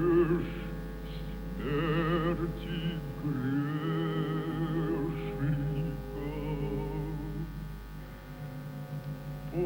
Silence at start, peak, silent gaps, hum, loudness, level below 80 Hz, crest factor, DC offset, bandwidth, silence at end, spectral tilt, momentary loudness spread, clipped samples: 0 s; -16 dBFS; none; 50 Hz at -45 dBFS; -34 LUFS; -44 dBFS; 16 dB; under 0.1%; over 20 kHz; 0 s; -8 dB/octave; 12 LU; under 0.1%